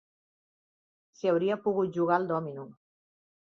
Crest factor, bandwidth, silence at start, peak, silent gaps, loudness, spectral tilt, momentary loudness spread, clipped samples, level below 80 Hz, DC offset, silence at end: 20 dB; 7 kHz; 1.25 s; -12 dBFS; none; -29 LUFS; -8 dB/octave; 15 LU; under 0.1%; -76 dBFS; under 0.1%; 0.7 s